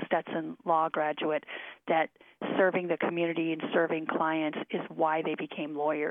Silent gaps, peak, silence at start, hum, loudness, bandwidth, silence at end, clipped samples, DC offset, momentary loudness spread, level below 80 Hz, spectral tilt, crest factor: none; -14 dBFS; 0 s; none; -30 LUFS; 3.8 kHz; 0 s; under 0.1%; under 0.1%; 8 LU; -84 dBFS; -8.5 dB/octave; 18 dB